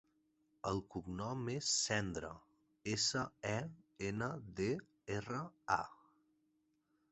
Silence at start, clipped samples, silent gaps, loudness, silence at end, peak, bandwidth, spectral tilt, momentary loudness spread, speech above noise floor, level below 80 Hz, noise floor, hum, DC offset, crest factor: 0.65 s; under 0.1%; none; -40 LUFS; 1.15 s; -18 dBFS; 8.2 kHz; -3.5 dB/octave; 11 LU; 40 dB; -66 dBFS; -80 dBFS; none; under 0.1%; 24 dB